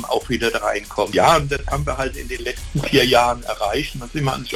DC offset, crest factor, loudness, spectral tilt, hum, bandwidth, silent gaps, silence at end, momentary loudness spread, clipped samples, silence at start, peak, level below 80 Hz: under 0.1%; 18 dB; -20 LUFS; -4.5 dB/octave; none; 18 kHz; none; 0 s; 11 LU; under 0.1%; 0 s; -2 dBFS; -34 dBFS